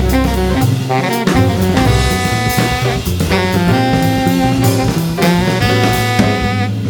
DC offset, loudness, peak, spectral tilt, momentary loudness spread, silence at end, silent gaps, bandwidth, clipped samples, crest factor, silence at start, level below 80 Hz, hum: under 0.1%; -13 LUFS; 0 dBFS; -5.5 dB/octave; 3 LU; 0 s; none; over 20 kHz; under 0.1%; 12 dB; 0 s; -24 dBFS; none